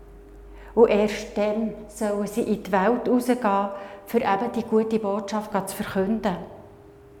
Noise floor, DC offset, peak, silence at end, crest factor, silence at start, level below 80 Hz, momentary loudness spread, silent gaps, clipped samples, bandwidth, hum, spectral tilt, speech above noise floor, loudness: -48 dBFS; under 0.1%; -6 dBFS; 0 s; 20 dB; 0 s; -50 dBFS; 9 LU; none; under 0.1%; 18 kHz; none; -6 dB/octave; 24 dB; -24 LUFS